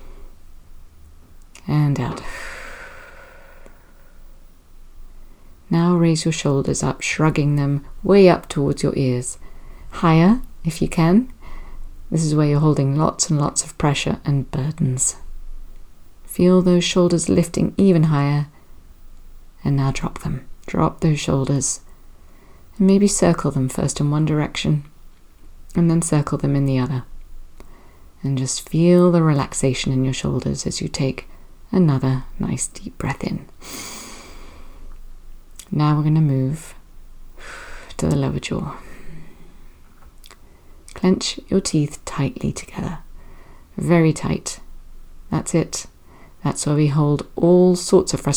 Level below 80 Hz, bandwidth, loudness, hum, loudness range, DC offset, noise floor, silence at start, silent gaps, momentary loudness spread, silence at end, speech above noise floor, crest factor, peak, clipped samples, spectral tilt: -38 dBFS; over 20 kHz; -19 LUFS; none; 9 LU; under 0.1%; -44 dBFS; 0 s; none; 16 LU; 0 s; 26 dB; 20 dB; 0 dBFS; under 0.1%; -6 dB/octave